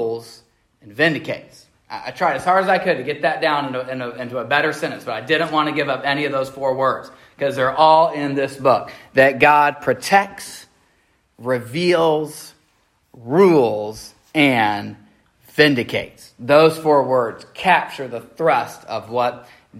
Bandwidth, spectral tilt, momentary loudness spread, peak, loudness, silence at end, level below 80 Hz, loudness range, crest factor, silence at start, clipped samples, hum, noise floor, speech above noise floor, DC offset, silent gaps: 16 kHz; -5 dB/octave; 17 LU; 0 dBFS; -18 LUFS; 0 s; -60 dBFS; 4 LU; 18 dB; 0 s; under 0.1%; none; -62 dBFS; 44 dB; under 0.1%; none